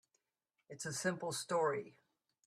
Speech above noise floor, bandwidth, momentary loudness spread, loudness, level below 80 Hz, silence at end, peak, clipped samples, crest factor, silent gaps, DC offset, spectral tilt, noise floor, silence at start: 48 dB; 14.5 kHz; 17 LU; -39 LUFS; -82 dBFS; 0.55 s; -22 dBFS; under 0.1%; 20 dB; none; under 0.1%; -3.5 dB/octave; -87 dBFS; 0.7 s